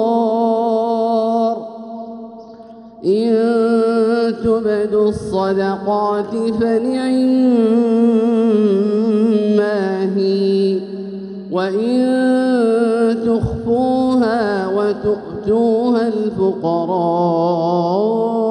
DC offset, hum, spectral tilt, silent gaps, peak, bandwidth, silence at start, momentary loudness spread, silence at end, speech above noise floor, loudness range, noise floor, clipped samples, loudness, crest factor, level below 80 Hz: under 0.1%; none; -7.5 dB/octave; none; -4 dBFS; 10.5 kHz; 0 s; 6 LU; 0 s; 22 dB; 3 LU; -37 dBFS; under 0.1%; -16 LUFS; 12 dB; -46 dBFS